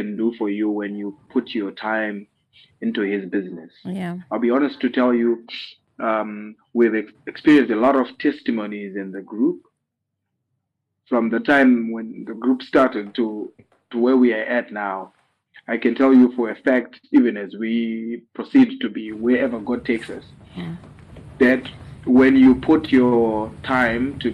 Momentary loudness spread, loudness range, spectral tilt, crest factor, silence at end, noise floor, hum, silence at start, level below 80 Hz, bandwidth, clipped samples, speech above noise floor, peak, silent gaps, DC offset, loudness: 17 LU; 7 LU; -7.5 dB/octave; 14 dB; 0 s; -79 dBFS; none; 0 s; -54 dBFS; 5.4 kHz; under 0.1%; 59 dB; -6 dBFS; none; under 0.1%; -20 LUFS